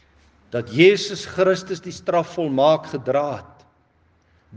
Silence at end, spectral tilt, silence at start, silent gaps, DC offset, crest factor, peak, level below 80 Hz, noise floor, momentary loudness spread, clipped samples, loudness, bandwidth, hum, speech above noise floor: 0 s; -5.5 dB/octave; 0.55 s; none; under 0.1%; 22 dB; 0 dBFS; -62 dBFS; -60 dBFS; 14 LU; under 0.1%; -20 LUFS; 9 kHz; none; 41 dB